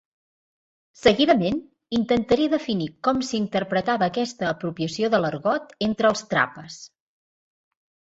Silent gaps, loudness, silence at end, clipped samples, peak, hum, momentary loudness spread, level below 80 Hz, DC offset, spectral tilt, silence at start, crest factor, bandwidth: none; -23 LUFS; 1.2 s; under 0.1%; -4 dBFS; none; 8 LU; -56 dBFS; under 0.1%; -5 dB/octave; 1.05 s; 20 dB; 8 kHz